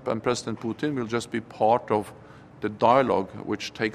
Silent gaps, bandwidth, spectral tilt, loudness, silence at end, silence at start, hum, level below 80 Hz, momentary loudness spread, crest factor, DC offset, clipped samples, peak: none; 14 kHz; -5.5 dB/octave; -26 LUFS; 0 s; 0 s; none; -62 dBFS; 12 LU; 20 dB; under 0.1%; under 0.1%; -6 dBFS